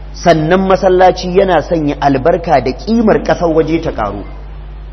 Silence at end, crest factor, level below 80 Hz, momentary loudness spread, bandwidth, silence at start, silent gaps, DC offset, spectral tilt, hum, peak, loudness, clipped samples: 0 s; 12 dB; -28 dBFS; 14 LU; 6.4 kHz; 0 s; none; under 0.1%; -6.5 dB/octave; none; 0 dBFS; -11 LUFS; 0.1%